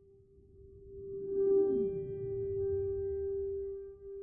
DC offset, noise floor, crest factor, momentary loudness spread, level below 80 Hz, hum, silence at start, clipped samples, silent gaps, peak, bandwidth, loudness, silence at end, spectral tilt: under 0.1%; -61 dBFS; 14 dB; 16 LU; -56 dBFS; none; 0.55 s; under 0.1%; none; -22 dBFS; 1.7 kHz; -35 LUFS; 0 s; -12.5 dB/octave